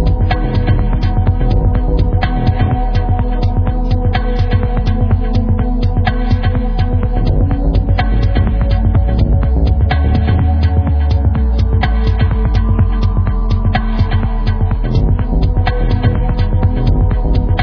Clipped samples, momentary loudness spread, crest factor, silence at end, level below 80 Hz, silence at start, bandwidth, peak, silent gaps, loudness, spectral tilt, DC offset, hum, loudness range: under 0.1%; 3 LU; 12 dB; 0 s; -14 dBFS; 0 s; 5.4 kHz; 0 dBFS; none; -15 LUFS; -9.5 dB/octave; under 0.1%; none; 2 LU